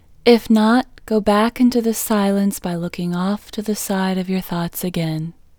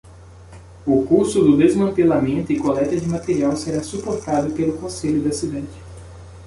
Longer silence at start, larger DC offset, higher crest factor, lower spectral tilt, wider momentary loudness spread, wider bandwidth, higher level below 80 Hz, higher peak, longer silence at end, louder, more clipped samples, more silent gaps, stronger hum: first, 0.25 s vs 0.05 s; neither; about the same, 18 dB vs 16 dB; about the same, -5.5 dB/octave vs -6.5 dB/octave; second, 10 LU vs 15 LU; first, over 20 kHz vs 11.5 kHz; about the same, -46 dBFS vs -44 dBFS; about the same, 0 dBFS vs -2 dBFS; first, 0.3 s vs 0 s; about the same, -19 LUFS vs -19 LUFS; neither; neither; neither